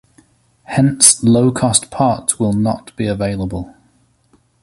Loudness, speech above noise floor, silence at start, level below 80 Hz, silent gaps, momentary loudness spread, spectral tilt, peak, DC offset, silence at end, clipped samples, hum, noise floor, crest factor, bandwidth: -14 LUFS; 41 dB; 0.7 s; -42 dBFS; none; 14 LU; -4 dB/octave; 0 dBFS; under 0.1%; 0.95 s; under 0.1%; none; -56 dBFS; 16 dB; 16 kHz